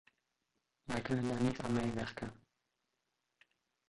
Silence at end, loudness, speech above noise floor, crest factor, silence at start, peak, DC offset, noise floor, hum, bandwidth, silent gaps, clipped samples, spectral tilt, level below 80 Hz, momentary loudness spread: 1.5 s; -38 LUFS; 49 dB; 20 dB; 0.85 s; -20 dBFS; under 0.1%; -85 dBFS; none; 11.5 kHz; none; under 0.1%; -6.5 dB/octave; -64 dBFS; 13 LU